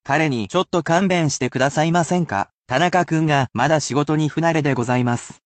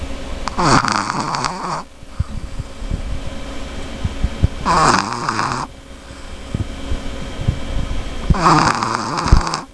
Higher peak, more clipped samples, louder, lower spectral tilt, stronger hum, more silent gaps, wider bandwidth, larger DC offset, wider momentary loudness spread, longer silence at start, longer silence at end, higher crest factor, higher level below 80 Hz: second, -4 dBFS vs 0 dBFS; neither; about the same, -19 LUFS vs -19 LUFS; about the same, -5.5 dB/octave vs -4.5 dB/octave; neither; first, 2.53-2.63 s vs none; second, 9 kHz vs 11 kHz; neither; second, 3 LU vs 16 LU; about the same, 0.05 s vs 0 s; first, 0.15 s vs 0 s; about the same, 14 dB vs 18 dB; second, -56 dBFS vs -24 dBFS